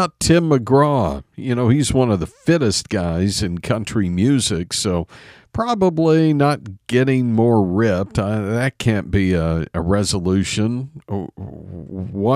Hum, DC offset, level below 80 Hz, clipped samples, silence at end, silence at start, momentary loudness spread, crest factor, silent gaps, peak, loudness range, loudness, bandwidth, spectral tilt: none; under 0.1%; -38 dBFS; under 0.1%; 0 s; 0 s; 13 LU; 16 dB; none; -2 dBFS; 3 LU; -18 LUFS; 14.5 kHz; -5.5 dB/octave